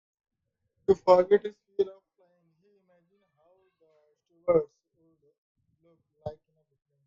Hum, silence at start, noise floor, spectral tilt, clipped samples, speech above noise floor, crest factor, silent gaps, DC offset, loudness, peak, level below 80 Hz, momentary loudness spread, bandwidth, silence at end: none; 0.9 s; -79 dBFS; -7.5 dB/octave; under 0.1%; 55 dB; 24 dB; 5.38-5.55 s; under 0.1%; -26 LUFS; -6 dBFS; -66 dBFS; 22 LU; 7.4 kHz; 0.75 s